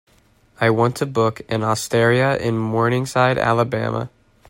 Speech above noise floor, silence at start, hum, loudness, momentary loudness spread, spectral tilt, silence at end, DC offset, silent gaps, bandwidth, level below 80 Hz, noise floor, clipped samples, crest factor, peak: 37 dB; 0.6 s; none; -19 LUFS; 7 LU; -6 dB/octave; 0.45 s; under 0.1%; none; 16.5 kHz; -52 dBFS; -56 dBFS; under 0.1%; 16 dB; -4 dBFS